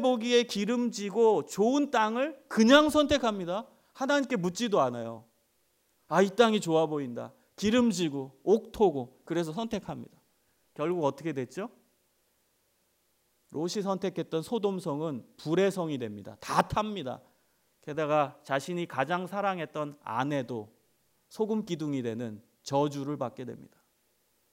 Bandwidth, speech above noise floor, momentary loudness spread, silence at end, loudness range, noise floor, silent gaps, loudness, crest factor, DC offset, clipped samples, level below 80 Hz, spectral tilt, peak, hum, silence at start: 16 kHz; 44 dB; 14 LU; 0.85 s; 10 LU; -72 dBFS; none; -29 LUFS; 22 dB; under 0.1%; under 0.1%; -62 dBFS; -5 dB/octave; -8 dBFS; none; 0 s